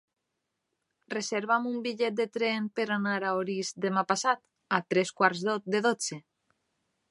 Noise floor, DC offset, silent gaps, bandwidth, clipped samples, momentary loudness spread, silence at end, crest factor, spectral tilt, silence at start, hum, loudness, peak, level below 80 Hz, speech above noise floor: -83 dBFS; under 0.1%; none; 11.5 kHz; under 0.1%; 7 LU; 0.9 s; 24 dB; -4 dB/octave; 1.1 s; none; -29 LUFS; -6 dBFS; -80 dBFS; 54 dB